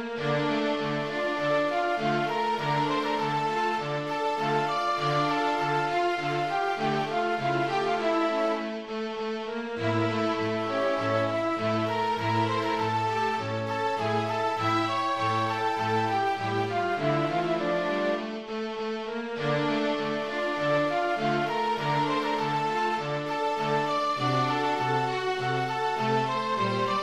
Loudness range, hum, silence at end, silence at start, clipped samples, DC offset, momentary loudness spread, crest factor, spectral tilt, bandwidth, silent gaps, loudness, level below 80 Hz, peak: 2 LU; none; 0 s; 0 s; under 0.1%; 0.2%; 4 LU; 14 dB; -5.5 dB/octave; 13 kHz; none; -27 LUFS; -64 dBFS; -12 dBFS